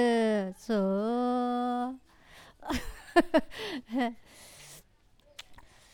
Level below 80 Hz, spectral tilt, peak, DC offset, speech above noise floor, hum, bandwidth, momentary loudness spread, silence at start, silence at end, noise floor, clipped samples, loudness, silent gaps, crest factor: -54 dBFS; -5.5 dB/octave; -6 dBFS; under 0.1%; 34 dB; none; 18.5 kHz; 23 LU; 0 s; 0.3 s; -63 dBFS; under 0.1%; -30 LUFS; none; 24 dB